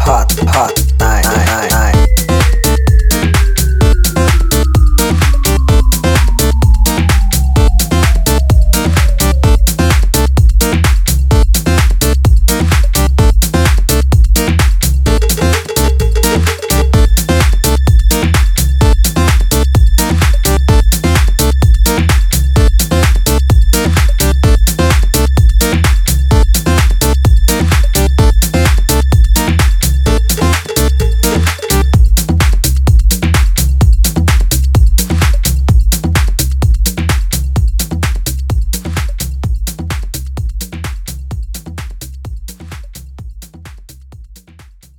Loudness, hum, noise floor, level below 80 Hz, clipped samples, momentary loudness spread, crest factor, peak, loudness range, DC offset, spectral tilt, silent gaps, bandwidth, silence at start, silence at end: -11 LUFS; none; -39 dBFS; -10 dBFS; under 0.1%; 8 LU; 10 dB; 0 dBFS; 7 LU; under 0.1%; -4.5 dB/octave; none; 19 kHz; 0 s; 0.65 s